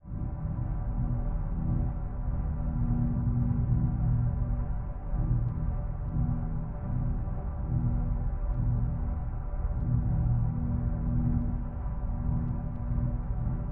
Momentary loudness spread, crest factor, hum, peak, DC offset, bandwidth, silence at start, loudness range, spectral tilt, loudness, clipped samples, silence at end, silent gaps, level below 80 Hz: 7 LU; 14 dB; none; -16 dBFS; under 0.1%; 2.5 kHz; 0.05 s; 2 LU; -13 dB/octave; -32 LUFS; under 0.1%; 0 s; none; -32 dBFS